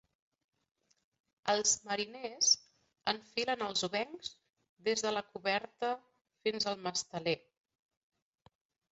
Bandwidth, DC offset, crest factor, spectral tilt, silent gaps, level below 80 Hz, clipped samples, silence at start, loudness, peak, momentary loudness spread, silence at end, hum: 8 kHz; under 0.1%; 24 dB; -1 dB/octave; 4.69-4.77 s, 6.21-6.25 s; -78 dBFS; under 0.1%; 1.45 s; -34 LUFS; -14 dBFS; 11 LU; 1.55 s; none